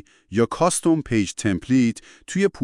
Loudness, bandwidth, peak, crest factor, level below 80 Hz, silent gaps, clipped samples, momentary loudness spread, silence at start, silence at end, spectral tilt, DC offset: -22 LUFS; 12 kHz; -6 dBFS; 16 dB; -50 dBFS; none; under 0.1%; 7 LU; 0.3 s; 0 s; -5 dB/octave; under 0.1%